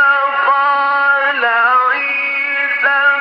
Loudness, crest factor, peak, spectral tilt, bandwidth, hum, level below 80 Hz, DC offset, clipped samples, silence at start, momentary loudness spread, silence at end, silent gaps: -12 LUFS; 10 dB; -2 dBFS; -2.5 dB/octave; 6 kHz; none; -88 dBFS; under 0.1%; under 0.1%; 0 s; 4 LU; 0 s; none